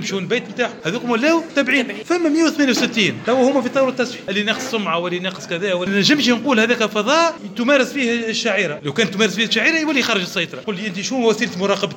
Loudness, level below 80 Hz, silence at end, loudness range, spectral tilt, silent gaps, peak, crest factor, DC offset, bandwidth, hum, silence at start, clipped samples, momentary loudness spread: -18 LUFS; -66 dBFS; 0 s; 2 LU; -3.5 dB/octave; none; -4 dBFS; 16 dB; under 0.1%; 17 kHz; none; 0 s; under 0.1%; 7 LU